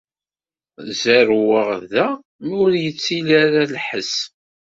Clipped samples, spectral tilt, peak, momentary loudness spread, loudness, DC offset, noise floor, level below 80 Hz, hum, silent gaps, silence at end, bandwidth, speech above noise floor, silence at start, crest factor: under 0.1%; -4.5 dB/octave; 0 dBFS; 13 LU; -18 LUFS; under 0.1%; under -90 dBFS; -62 dBFS; none; 2.25-2.39 s; 0.4 s; 7.8 kHz; over 73 dB; 0.8 s; 18 dB